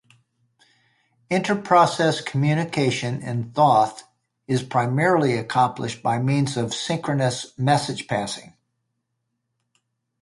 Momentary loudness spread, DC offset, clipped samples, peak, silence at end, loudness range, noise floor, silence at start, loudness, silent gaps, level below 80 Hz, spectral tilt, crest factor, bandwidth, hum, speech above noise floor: 9 LU; under 0.1%; under 0.1%; -4 dBFS; 1.8 s; 5 LU; -77 dBFS; 1.3 s; -22 LUFS; none; -62 dBFS; -5.5 dB/octave; 20 dB; 11.5 kHz; none; 56 dB